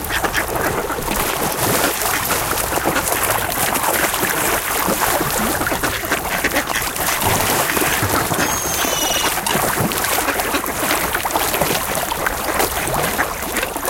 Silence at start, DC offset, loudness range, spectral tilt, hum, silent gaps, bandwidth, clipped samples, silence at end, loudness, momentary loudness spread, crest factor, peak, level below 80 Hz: 0 s; under 0.1%; 1 LU; -2.5 dB/octave; none; none; 17.5 kHz; under 0.1%; 0 s; -17 LUFS; 3 LU; 18 dB; -2 dBFS; -36 dBFS